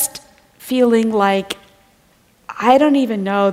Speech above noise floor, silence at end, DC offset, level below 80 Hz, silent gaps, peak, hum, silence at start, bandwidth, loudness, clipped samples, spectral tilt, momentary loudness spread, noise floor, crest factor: 40 dB; 0 s; under 0.1%; -58 dBFS; none; 0 dBFS; none; 0 s; 16 kHz; -15 LUFS; under 0.1%; -4.5 dB/octave; 20 LU; -55 dBFS; 16 dB